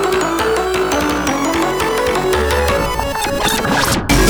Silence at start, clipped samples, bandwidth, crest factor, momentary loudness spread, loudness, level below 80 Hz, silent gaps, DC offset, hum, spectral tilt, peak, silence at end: 0 s; under 0.1%; over 20 kHz; 14 dB; 2 LU; -16 LUFS; -26 dBFS; none; under 0.1%; none; -4 dB/octave; 0 dBFS; 0 s